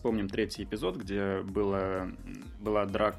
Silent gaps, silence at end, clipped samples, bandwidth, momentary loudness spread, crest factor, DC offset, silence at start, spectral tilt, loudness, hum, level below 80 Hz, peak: none; 0 s; under 0.1%; 13.5 kHz; 9 LU; 20 dB; under 0.1%; 0 s; -6.5 dB/octave; -33 LUFS; none; -48 dBFS; -12 dBFS